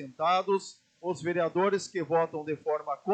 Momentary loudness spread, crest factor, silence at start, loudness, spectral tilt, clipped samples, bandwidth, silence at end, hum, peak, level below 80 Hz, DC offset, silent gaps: 8 LU; 16 dB; 0 s; -30 LUFS; -5 dB/octave; under 0.1%; 9.2 kHz; 0 s; none; -14 dBFS; -80 dBFS; under 0.1%; none